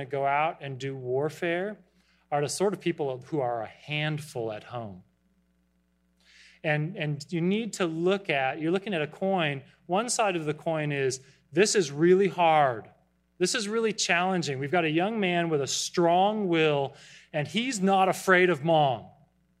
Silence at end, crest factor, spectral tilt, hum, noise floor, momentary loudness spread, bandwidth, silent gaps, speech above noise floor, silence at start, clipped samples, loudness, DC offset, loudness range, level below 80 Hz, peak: 0.5 s; 20 dB; -4.5 dB/octave; none; -70 dBFS; 12 LU; 14.5 kHz; none; 43 dB; 0 s; under 0.1%; -27 LUFS; under 0.1%; 9 LU; -72 dBFS; -6 dBFS